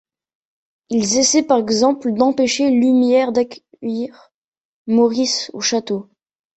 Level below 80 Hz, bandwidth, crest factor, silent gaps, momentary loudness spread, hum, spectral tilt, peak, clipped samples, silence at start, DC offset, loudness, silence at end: -60 dBFS; 8.2 kHz; 16 dB; 4.34-4.52 s, 4.60-4.85 s; 12 LU; none; -3 dB/octave; -2 dBFS; under 0.1%; 0.9 s; under 0.1%; -17 LUFS; 0.55 s